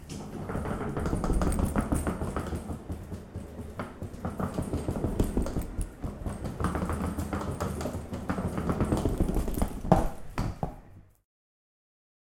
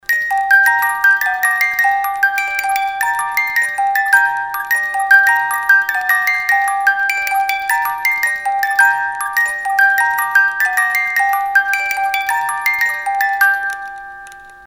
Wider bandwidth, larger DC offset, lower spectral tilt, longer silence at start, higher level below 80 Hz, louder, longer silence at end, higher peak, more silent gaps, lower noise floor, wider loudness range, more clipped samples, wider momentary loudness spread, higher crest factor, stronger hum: second, 17 kHz vs 19.5 kHz; neither; first, -7 dB/octave vs 2 dB/octave; about the same, 0 s vs 0.1 s; first, -36 dBFS vs -56 dBFS; second, -33 LUFS vs -14 LUFS; first, 1.25 s vs 0 s; second, -4 dBFS vs 0 dBFS; neither; first, -51 dBFS vs -36 dBFS; about the same, 4 LU vs 2 LU; neither; first, 11 LU vs 5 LU; first, 26 dB vs 16 dB; neither